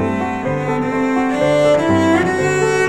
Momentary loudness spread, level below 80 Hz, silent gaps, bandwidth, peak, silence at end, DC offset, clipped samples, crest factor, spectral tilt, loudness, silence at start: 6 LU; -48 dBFS; none; 13.5 kHz; -4 dBFS; 0 s; 0.7%; under 0.1%; 12 dB; -6 dB/octave; -16 LUFS; 0 s